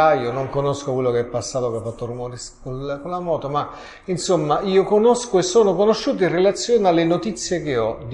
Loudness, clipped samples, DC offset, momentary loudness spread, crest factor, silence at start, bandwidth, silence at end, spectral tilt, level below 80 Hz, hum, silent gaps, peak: -20 LUFS; under 0.1%; under 0.1%; 13 LU; 16 dB; 0 s; 11.5 kHz; 0 s; -5 dB/octave; -48 dBFS; none; none; -4 dBFS